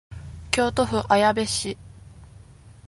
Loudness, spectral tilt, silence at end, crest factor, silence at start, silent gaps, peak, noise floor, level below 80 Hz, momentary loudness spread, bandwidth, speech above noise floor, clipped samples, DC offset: -22 LUFS; -4 dB/octave; 0.2 s; 20 dB; 0.1 s; none; -4 dBFS; -48 dBFS; -44 dBFS; 20 LU; 12 kHz; 26 dB; under 0.1%; under 0.1%